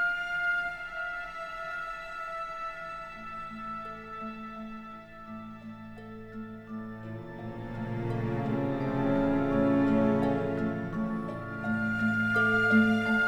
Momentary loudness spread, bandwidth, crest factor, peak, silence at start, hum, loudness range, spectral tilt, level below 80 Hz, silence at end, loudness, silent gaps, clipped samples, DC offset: 18 LU; 10 kHz; 18 dB; -12 dBFS; 0 s; none; 14 LU; -7.5 dB/octave; -50 dBFS; 0 s; -30 LUFS; none; under 0.1%; under 0.1%